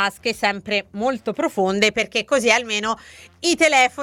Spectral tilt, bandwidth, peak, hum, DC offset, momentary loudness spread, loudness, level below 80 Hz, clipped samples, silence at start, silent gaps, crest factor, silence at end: -2.5 dB/octave; 18 kHz; 0 dBFS; none; under 0.1%; 9 LU; -19 LUFS; -56 dBFS; under 0.1%; 0 s; none; 20 dB; 0 s